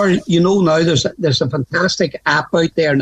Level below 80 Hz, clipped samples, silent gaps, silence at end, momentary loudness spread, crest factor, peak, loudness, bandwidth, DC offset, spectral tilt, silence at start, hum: -48 dBFS; under 0.1%; none; 0 s; 4 LU; 12 dB; -2 dBFS; -15 LUFS; 8.8 kHz; under 0.1%; -5 dB/octave; 0 s; none